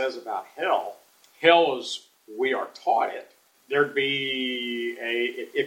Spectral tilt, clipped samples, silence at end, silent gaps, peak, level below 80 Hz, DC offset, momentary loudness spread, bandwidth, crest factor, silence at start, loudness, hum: -3.5 dB/octave; under 0.1%; 0 s; none; -2 dBFS; -84 dBFS; under 0.1%; 14 LU; 16.5 kHz; 24 dB; 0 s; -25 LUFS; none